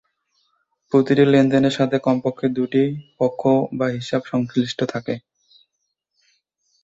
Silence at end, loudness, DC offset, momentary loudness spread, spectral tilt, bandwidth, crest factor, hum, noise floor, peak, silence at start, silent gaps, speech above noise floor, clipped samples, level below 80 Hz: 1.65 s; -20 LUFS; under 0.1%; 10 LU; -7 dB/octave; 7.8 kHz; 18 dB; none; -76 dBFS; -4 dBFS; 0.95 s; none; 57 dB; under 0.1%; -62 dBFS